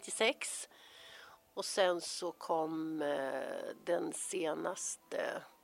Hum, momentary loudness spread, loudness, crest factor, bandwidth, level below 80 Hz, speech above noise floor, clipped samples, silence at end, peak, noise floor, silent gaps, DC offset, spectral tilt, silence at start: none; 17 LU; -37 LUFS; 22 dB; 16 kHz; -86 dBFS; 20 dB; under 0.1%; 0.15 s; -16 dBFS; -57 dBFS; none; under 0.1%; -2 dB/octave; 0 s